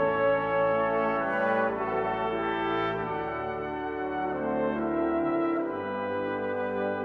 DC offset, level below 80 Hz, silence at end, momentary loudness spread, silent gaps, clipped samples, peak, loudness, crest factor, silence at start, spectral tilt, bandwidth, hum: under 0.1%; -56 dBFS; 0 s; 6 LU; none; under 0.1%; -14 dBFS; -28 LUFS; 14 dB; 0 s; -8 dB/octave; 5.6 kHz; none